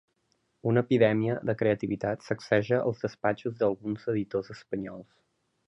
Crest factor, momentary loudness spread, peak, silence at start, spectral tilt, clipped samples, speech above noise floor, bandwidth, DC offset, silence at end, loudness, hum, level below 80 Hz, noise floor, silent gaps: 20 dB; 12 LU; -10 dBFS; 0.65 s; -8 dB/octave; under 0.1%; 46 dB; 8.2 kHz; under 0.1%; 0.65 s; -29 LUFS; none; -64 dBFS; -74 dBFS; none